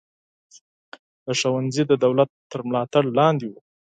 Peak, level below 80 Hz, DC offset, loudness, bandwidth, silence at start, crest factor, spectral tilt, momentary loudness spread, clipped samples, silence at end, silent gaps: -4 dBFS; -68 dBFS; under 0.1%; -21 LUFS; 9.2 kHz; 1.25 s; 20 dB; -5.5 dB/octave; 12 LU; under 0.1%; 0.35 s; 2.29-2.50 s